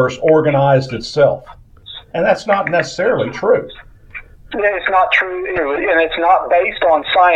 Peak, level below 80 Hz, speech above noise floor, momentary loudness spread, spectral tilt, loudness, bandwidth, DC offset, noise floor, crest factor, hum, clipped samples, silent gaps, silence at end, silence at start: 0 dBFS; -44 dBFS; 22 dB; 17 LU; -5.5 dB/octave; -15 LUFS; 9 kHz; under 0.1%; -37 dBFS; 14 dB; none; under 0.1%; none; 0 s; 0 s